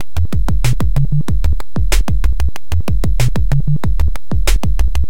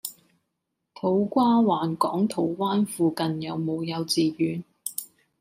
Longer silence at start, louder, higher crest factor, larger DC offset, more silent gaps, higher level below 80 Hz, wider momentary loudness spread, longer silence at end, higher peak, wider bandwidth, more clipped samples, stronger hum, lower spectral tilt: about the same, 0.15 s vs 0.05 s; first, -18 LUFS vs -25 LUFS; second, 12 dB vs 18 dB; first, 30% vs under 0.1%; neither; first, -16 dBFS vs -72 dBFS; second, 3 LU vs 12 LU; second, 0.05 s vs 0.35 s; first, 0 dBFS vs -8 dBFS; about the same, 17 kHz vs 16 kHz; neither; neither; about the same, -5.5 dB/octave vs -5.5 dB/octave